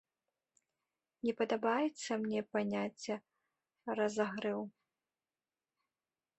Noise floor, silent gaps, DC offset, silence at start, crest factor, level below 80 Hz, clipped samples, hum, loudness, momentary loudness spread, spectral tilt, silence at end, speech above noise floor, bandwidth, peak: under -90 dBFS; none; under 0.1%; 1.25 s; 20 dB; -82 dBFS; under 0.1%; none; -37 LUFS; 9 LU; -5 dB/octave; 1.7 s; over 54 dB; 8.2 kHz; -20 dBFS